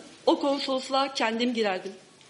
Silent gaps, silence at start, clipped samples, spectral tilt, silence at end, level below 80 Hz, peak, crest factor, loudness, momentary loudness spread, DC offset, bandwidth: none; 0 s; under 0.1%; -3.5 dB/octave; 0.3 s; -78 dBFS; -10 dBFS; 18 dB; -27 LUFS; 5 LU; under 0.1%; 11 kHz